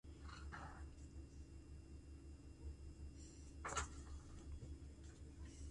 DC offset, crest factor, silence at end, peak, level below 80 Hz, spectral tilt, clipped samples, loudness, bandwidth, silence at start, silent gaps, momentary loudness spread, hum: under 0.1%; 24 dB; 0 s; -30 dBFS; -56 dBFS; -4 dB/octave; under 0.1%; -55 LUFS; 11 kHz; 0.05 s; none; 12 LU; none